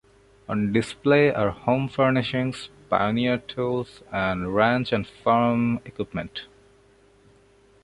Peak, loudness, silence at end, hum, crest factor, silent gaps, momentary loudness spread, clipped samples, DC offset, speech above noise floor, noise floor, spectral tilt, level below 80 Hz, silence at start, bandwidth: -4 dBFS; -24 LUFS; 1.4 s; none; 20 dB; none; 11 LU; under 0.1%; under 0.1%; 33 dB; -57 dBFS; -7 dB/octave; -52 dBFS; 0.5 s; 11 kHz